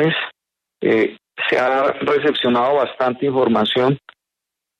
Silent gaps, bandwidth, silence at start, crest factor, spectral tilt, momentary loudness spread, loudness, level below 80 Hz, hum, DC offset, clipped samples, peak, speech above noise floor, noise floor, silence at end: none; 8.8 kHz; 0 s; 14 dB; -6.5 dB/octave; 7 LU; -18 LUFS; -62 dBFS; none; under 0.1%; under 0.1%; -4 dBFS; 66 dB; -83 dBFS; 0.8 s